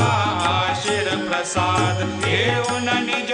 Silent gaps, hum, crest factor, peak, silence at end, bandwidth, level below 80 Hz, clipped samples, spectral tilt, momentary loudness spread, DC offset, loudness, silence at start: none; none; 16 dB; -6 dBFS; 0 s; 10 kHz; -50 dBFS; under 0.1%; -4 dB/octave; 3 LU; under 0.1%; -20 LUFS; 0 s